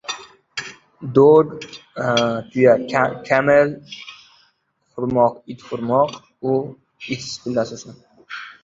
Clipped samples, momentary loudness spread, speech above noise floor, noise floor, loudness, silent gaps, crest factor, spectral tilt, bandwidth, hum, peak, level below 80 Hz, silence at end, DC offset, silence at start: under 0.1%; 21 LU; 47 dB; -65 dBFS; -18 LUFS; none; 18 dB; -5.5 dB/octave; 7.8 kHz; none; 0 dBFS; -58 dBFS; 0.15 s; under 0.1%; 0.1 s